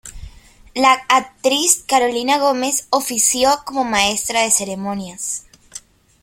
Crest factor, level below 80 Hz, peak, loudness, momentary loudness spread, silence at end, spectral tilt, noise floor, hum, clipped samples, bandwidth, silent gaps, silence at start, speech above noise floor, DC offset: 18 dB; -48 dBFS; 0 dBFS; -16 LUFS; 15 LU; 0.45 s; -1.5 dB/octave; -42 dBFS; none; under 0.1%; 16.5 kHz; none; 0.05 s; 25 dB; under 0.1%